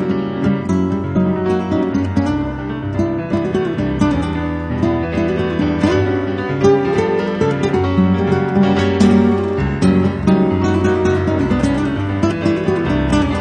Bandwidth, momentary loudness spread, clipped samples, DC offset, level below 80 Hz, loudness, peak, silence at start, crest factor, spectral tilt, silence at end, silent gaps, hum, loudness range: 9.8 kHz; 5 LU; under 0.1%; under 0.1%; -34 dBFS; -16 LUFS; 0 dBFS; 0 s; 14 dB; -7.5 dB/octave; 0 s; none; none; 4 LU